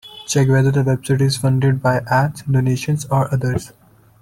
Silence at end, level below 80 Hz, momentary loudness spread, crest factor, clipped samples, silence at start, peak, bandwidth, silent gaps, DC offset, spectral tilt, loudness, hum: 0.55 s; -44 dBFS; 6 LU; 14 dB; under 0.1%; 0.05 s; -4 dBFS; 14 kHz; none; under 0.1%; -6 dB/octave; -17 LUFS; none